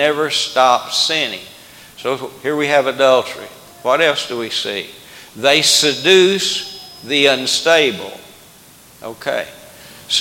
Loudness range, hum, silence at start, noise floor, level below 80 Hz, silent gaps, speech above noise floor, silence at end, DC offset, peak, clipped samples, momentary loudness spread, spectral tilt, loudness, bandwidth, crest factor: 4 LU; none; 0 s; -44 dBFS; -62 dBFS; none; 28 dB; 0 s; under 0.1%; 0 dBFS; under 0.1%; 21 LU; -2 dB/octave; -15 LUFS; 17.5 kHz; 16 dB